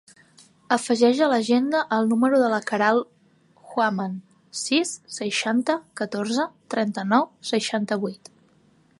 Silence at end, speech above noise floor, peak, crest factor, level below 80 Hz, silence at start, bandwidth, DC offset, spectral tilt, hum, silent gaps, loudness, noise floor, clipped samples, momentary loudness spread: 0.85 s; 37 dB; -4 dBFS; 20 dB; -76 dBFS; 0.7 s; 11.5 kHz; under 0.1%; -4 dB/octave; none; none; -23 LUFS; -59 dBFS; under 0.1%; 11 LU